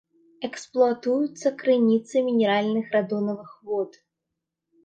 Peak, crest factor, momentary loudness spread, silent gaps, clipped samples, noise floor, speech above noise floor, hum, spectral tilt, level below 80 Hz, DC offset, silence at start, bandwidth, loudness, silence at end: -8 dBFS; 18 dB; 13 LU; none; under 0.1%; -83 dBFS; 60 dB; none; -6 dB/octave; -76 dBFS; under 0.1%; 0.4 s; 9 kHz; -24 LUFS; 0.95 s